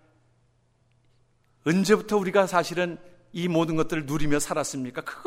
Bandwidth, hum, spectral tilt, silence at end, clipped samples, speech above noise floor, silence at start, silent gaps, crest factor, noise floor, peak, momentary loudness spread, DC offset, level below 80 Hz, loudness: 16 kHz; none; -5 dB/octave; 0 s; under 0.1%; 41 dB; 1.65 s; none; 20 dB; -65 dBFS; -6 dBFS; 10 LU; under 0.1%; -50 dBFS; -25 LUFS